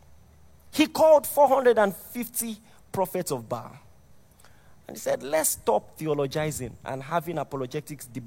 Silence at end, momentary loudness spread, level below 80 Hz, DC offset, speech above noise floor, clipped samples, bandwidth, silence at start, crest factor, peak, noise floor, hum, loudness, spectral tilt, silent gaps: 0 s; 17 LU; -60 dBFS; under 0.1%; 28 dB; under 0.1%; 16.5 kHz; 0.75 s; 20 dB; -8 dBFS; -53 dBFS; none; -25 LUFS; -4 dB/octave; none